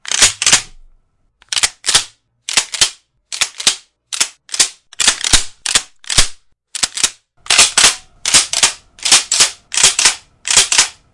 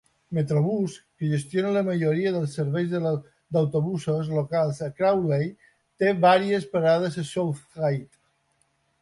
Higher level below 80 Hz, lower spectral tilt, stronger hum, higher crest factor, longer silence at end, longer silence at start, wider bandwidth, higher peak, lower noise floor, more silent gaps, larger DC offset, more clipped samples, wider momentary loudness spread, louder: first, -34 dBFS vs -64 dBFS; second, 1.5 dB/octave vs -7 dB/octave; neither; about the same, 16 dB vs 18 dB; second, 0.2 s vs 0.95 s; second, 0.05 s vs 0.3 s; about the same, 12 kHz vs 11.5 kHz; first, 0 dBFS vs -6 dBFS; second, -55 dBFS vs -69 dBFS; neither; neither; first, 0.3% vs under 0.1%; first, 11 LU vs 7 LU; first, -12 LUFS vs -25 LUFS